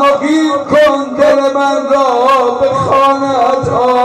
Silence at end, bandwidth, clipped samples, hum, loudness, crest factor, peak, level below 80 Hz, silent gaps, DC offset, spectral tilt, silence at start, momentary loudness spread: 0 s; 13 kHz; under 0.1%; none; -10 LUFS; 10 dB; 0 dBFS; -46 dBFS; none; under 0.1%; -5 dB/octave; 0 s; 3 LU